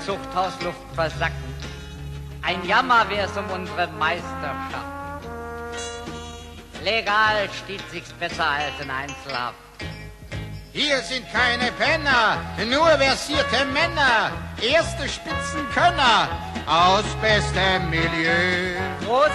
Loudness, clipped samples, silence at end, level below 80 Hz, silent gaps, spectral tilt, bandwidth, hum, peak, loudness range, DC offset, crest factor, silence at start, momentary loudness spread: -21 LUFS; under 0.1%; 0 s; -40 dBFS; none; -4 dB/octave; 13 kHz; none; -6 dBFS; 8 LU; under 0.1%; 18 dB; 0 s; 16 LU